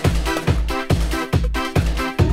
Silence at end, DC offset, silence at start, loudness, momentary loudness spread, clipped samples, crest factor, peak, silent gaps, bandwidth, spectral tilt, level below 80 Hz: 0 s; under 0.1%; 0 s; -21 LUFS; 1 LU; under 0.1%; 14 dB; -4 dBFS; none; 16 kHz; -6 dB/octave; -24 dBFS